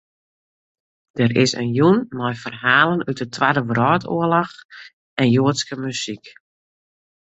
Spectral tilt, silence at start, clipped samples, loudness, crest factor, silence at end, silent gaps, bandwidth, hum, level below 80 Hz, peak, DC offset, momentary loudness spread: -5.5 dB/octave; 1.15 s; under 0.1%; -19 LUFS; 20 dB; 0.9 s; 4.65-4.69 s, 4.93-5.17 s; 8.2 kHz; none; -58 dBFS; -2 dBFS; under 0.1%; 13 LU